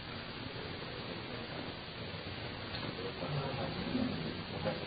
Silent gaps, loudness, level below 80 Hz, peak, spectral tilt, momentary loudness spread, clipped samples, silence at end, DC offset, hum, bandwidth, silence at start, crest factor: none; -40 LUFS; -56 dBFS; -22 dBFS; -4 dB/octave; 6 LU; under 0.1%; 0 s; under 0.1%; none; 4.9 kHz; 0 s; 18 dB